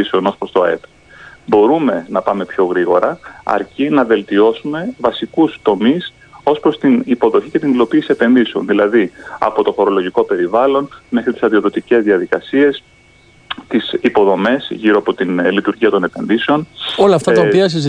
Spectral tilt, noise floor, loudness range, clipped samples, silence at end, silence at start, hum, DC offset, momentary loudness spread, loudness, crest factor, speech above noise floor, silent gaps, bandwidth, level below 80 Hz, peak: -6.5 dB/octave; -47 dBFS; 2 LU; under 0.1%; 0 s; 0 s; none; under 0.1%; 7 LU; -14 LUFS; 14 dB; 33 dB; none; 10 kHz; -54 dBFS; 0 dBFS